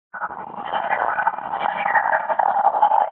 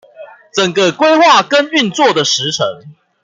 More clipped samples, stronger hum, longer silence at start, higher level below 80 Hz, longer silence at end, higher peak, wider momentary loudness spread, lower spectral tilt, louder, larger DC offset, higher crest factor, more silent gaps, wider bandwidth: neither; neither; about the same, 0.15 s vs 0.2 s; second, -68 dBFS vs -62 dBFS; second, 0 s vs 0.3 s; second, -4 dBFS vs 0 dBFS; first, 12 LU vs 9 LU; second, -0.5 dB/octave vs -3 dB/octave; second, -21 LUFS vs -11 LUFS; neither; about the same, 16 dB vs 12 dB; neither; second, 4 kHz vs 9.4 kHz